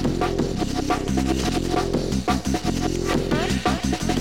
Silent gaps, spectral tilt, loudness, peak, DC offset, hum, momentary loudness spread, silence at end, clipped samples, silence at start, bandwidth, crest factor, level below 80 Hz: none; -5 dB/octave; -23 LUFS; -8 dBFS; 0.8%; none; 2 LU; 0 s; under 0.1%; 0 s; 17 kHz; 14 dB; -32 dBFS